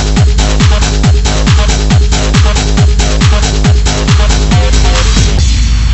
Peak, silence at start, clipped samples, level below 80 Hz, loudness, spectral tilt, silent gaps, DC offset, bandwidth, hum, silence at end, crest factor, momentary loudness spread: 0 dBFS; 0 s; 0.2%; -10 dBFS; -9 LUFS; -4.5 dB/octave; none; under 0.1%; 8.4 kHz; none; 0 s; 6 dB; 1 LU